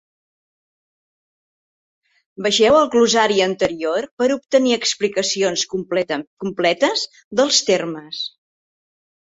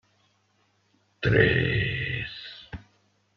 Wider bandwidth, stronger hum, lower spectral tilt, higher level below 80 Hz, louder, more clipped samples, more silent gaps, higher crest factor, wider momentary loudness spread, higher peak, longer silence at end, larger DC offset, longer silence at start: first, 8.2 kHz vs 6.4 kHz; neither; second, -2.5 dB/octave vs -8 dB/octave; second, -60 dBFS vs -46 dBFS; first, -18 LUFS vs -25 LUFS; neither; first, 4.11-4.17 s, 6.27-6.37 s, 7.24-7.31 s vs none; second, 18 dB vs 24 dB; second, 11 LU vs 22 LU; about the same, -2 dBFS vs -4 dBFS; first, 1.1 s vs 0.55 s; neither; first, 2.4 s vs 1.2 s